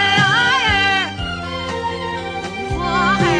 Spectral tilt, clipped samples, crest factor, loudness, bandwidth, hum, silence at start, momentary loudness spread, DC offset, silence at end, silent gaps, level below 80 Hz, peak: -4 dB/octave; under 0.1%; 16 dB; -17 LUFS; 10.5 kHz; none; 0 s; 12 LU; under 0.1%; 0 s; none; -36 dBFS; -2 dBFS